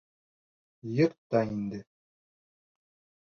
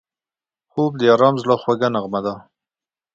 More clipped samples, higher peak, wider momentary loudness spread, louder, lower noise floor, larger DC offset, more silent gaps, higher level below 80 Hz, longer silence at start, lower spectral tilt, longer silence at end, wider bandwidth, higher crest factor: neither; second, -12 dBFS vs 0 dBFS; about the same, 16 LU vs 14 LU; second, -30 LUFS vs -18 LUFS; about the same, under -90 dBFS vs under -90 dBFS; neither; first, 1.18-1.30 s vs none; second, -68 dBFS vs -62 dBFS; about the same, 0.85 s vs 0.75 s; first, -8.5 dB/octave vs -7 dB/octave; first, 1.45 s vs 0.75 s; second, 6.8 kHz vs 7.6 kHz; about the same, 22 dB vs 20 dB